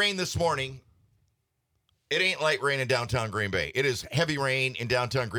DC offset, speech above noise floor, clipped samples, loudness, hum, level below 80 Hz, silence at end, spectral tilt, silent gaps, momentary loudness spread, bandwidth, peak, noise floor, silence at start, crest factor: under 0.1%; 49 dB; under 0.1%; -27 LUFS; none; -56 dBFS; 0 s; -4 dB/octave; none; 4 LU; 19 kHz; -10 dBFS; -77 dBFS; 0 s; 18 dB